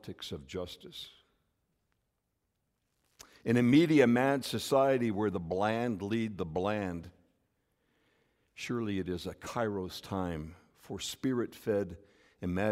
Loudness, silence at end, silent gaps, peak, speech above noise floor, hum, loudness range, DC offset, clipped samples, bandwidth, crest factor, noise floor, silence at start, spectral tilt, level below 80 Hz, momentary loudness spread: -32 LUFS; 0 s; none; -12 dBFS; 50 dB; none; 10 LU; under 0.1%; under 0.1%; 16 kHz; 22 dB; -82 dBFS; 0.05 s; -6 dB/octave; -62 dBFS; 18 LU